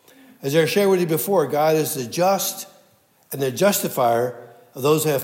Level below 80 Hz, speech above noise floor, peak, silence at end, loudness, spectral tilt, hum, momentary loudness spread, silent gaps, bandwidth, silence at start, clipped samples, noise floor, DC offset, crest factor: -76 dBFS; 38 dB; -6 dBFS; 0 s; -20 LUFS; -4.5 dB/octave; none; 15 LU; none; 16.5 kHz; 0.4 s; under 0.1%; -58 dBFS; under 0.1%; 16 dB